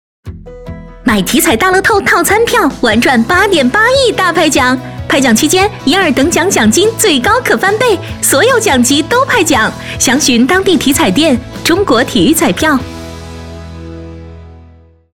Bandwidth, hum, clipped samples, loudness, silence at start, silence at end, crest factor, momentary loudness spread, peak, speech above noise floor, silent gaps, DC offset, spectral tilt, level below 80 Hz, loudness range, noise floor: 19.5 kHz; none; under 0.1%; -9 LUFS; 0.25 s; 0.55 s; 10 dB; 19 LU; 0 dBFS; 31 dB; none; under 0.1%; -3 dB/octave; -34 dBFS; 3 LU; -40 dBFS